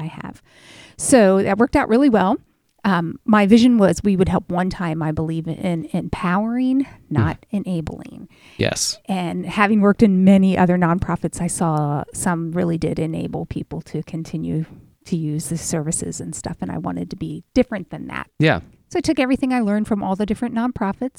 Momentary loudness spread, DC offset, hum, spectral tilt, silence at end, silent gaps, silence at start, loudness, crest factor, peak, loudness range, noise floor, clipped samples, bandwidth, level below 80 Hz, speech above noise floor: 14 LU; under 0.1%; none; -6 dB/octave; 0.1 s; none; 0 s; -19 LUFS; 20 dB; 0 dBFS; 9 LU; -46 dBFS; under 0.1%; 13.5 kHz; -44 dBFS; 27 dB